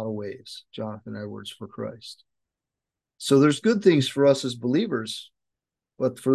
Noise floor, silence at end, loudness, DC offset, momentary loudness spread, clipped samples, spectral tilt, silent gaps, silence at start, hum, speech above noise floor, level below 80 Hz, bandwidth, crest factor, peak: -88 dBFS; 0 s; -23 LUFS; under 0.1%; 18 LU; under 0.1%; -5.5 dB/octave; none; 0 s; none; 65 dB; -68 dBFS; 12.5 kHz; 20 dB; -6 dBFS